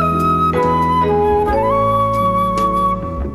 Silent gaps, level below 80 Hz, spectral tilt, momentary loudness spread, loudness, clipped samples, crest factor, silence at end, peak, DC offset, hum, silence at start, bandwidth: none; -30 dBFS; -7.5 dB/octave; 2 LU; -15 LUFS; under 0.1%; 10 dB; 0 s; -4 dBFS; under 0.1%; none; 0 s; 14 kHz